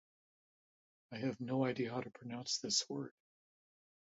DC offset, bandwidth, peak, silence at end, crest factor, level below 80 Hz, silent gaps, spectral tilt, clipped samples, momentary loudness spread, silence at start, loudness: under 0.1%; 7.6 kHz; -20 dBFS; 1.05 s; 22 dB; -82 dBFS; none; -4 dB/octave; under 0.1%; 12 LU; 1.1 s; -39 LUFS